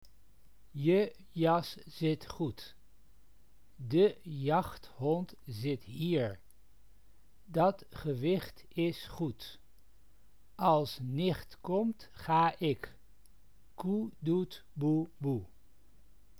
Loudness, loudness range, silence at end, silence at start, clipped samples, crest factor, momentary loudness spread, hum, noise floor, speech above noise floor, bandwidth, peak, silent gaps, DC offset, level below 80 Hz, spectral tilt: -34 LUFS; 3 LU; 0.95 s; 0.75 s; under 0.1%; 20 dB; 13 LU; none; -66 dBFS; 33 dB; over 20 kHz; -14 dBFS; none; 0.2%; -62 dBFS; -7.5 dB/octave